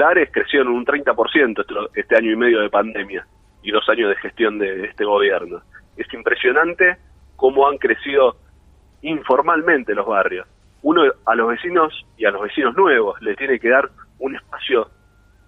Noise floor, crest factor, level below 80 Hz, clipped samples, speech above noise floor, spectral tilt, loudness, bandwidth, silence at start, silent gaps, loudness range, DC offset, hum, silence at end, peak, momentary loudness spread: -53 dBFS; 16 dB; -54 dBFS; under 0.1%; 35 dB; -6.5 dB/octave; -18 LUFS; 4 kHz; 0 s; none; 2 LU; under 0.1%; none; 0.65 s; -2 dBFS; 13 LU